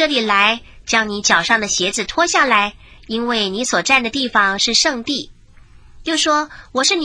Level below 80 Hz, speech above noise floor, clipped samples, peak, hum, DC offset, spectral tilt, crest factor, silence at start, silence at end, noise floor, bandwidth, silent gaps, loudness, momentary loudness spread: -46 dBFS; 27 dB; under 0.1%; 0 dBFS; none; under 0.1%; -1.5 dB/octave; 18 dB; 0 s; 0 s; -44 dBFS; 10.5 kHz; none; -16 LUFS; 10 LU